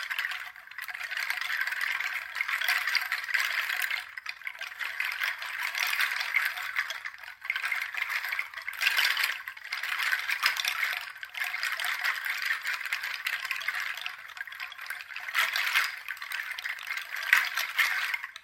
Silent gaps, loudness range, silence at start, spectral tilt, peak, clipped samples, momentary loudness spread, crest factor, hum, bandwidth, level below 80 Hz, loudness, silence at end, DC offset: none; 3 LU; 0 s; 3.5 dB/octave; -4 dBFS; under 0.1%; 12 LU; 28 dB; none; 16.5 kHz; -78 dBFS; -29 LUFS; 0 s; under 0.1%